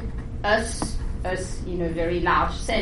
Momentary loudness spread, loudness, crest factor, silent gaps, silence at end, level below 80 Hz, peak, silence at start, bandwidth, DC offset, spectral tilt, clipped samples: 9 LU; -25 LUFS; 16 dB; none; 0 s; -32 dBFS; -8 dBFS; 0 s; 11.5 kHz; 0.3%; -4.5 dB/octave; under 0.1%